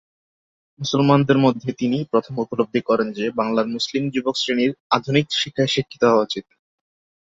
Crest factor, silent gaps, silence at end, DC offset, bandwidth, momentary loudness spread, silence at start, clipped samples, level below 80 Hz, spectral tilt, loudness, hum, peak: 20 dB; 4.80-4.90 s; 0.95 s; under 0.1%; 7.8 kHz; 7 LU; 0.8 s; under 0.1%; -60 dBFS; -5.5 dB/octave; -20 LUFS; none; -2 dBFS